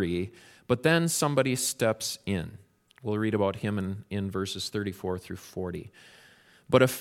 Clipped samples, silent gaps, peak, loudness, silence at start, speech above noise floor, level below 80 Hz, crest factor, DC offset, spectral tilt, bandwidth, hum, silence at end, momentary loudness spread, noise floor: under 0.1%; none; -6 dBFS; -29 LUFS; 0 s; 29 dB; -60 dBFS; 24 dB; under 0.1%; -4.5 dB/octave; 17 kHz; none; 0 s; 14 LU; -57 dBFS